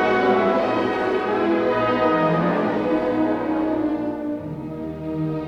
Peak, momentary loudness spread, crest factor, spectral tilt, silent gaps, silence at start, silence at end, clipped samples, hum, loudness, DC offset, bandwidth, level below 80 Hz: -8 dBFS; 10 LU; 14 dB; -8 dB/octave; none; 0 s; 0 s; under 0.1%; none; -21 LUFS; under 0.1%; 7.4 kHz; -52 dBFS